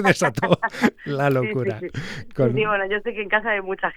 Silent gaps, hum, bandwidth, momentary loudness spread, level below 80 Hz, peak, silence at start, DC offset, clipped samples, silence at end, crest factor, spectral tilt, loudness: none; none; 17.5 kHz; 9 LU; -50 dBFS; -2 dBFS; 0 s; under 0.1%; under 0.1%; 0 s; 20 dB; -5.5 dB/octave; -22 LUFS